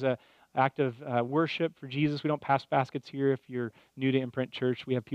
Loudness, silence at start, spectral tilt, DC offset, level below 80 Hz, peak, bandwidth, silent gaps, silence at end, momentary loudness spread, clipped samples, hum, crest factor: -31 LUFS; 0 s; -8 dB/octave; under 0.1%; -72 dBFS; -10 dBFS; 8.2 kHz; none; 0 s; 8 LU; under 0.1%; none; 20 dB